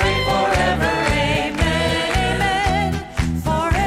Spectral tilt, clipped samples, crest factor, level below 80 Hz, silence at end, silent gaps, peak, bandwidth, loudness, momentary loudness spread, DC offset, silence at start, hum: -5 dB/octave; under 0.1%; 14 dB; -28 dBFS; 0 s; none; -4 dBFS; 15.5 kHz; -19 LUFS; 4 LU; under 0.1%; 0 s; none